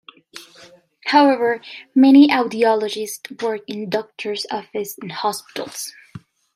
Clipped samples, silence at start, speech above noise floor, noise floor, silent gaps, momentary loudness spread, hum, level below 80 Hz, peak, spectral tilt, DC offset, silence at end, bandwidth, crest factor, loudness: under 0.1%; 0.35 s; 30 dB; -48 dBFS; none; 18 LU; none; -70 dBFS; -2 dBFS; -4 dB/octave; under 0.1%; 0.4 s; 15.5 kHz; 18 dB; -18 LUFS